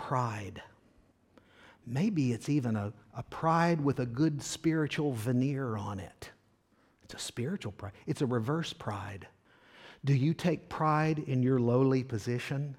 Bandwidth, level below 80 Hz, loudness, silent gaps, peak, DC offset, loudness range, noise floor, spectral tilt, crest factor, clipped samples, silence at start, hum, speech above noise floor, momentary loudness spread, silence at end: 15 kHz; -64 dBFS; -32 LUFS; none; -14 dBFS; under 0.1%; 7 LU; -68 dBFS; -6.5 dB/octave; 18 dB; under 0.1%; 0 s; none; 37 dB; 16 LU; 0 s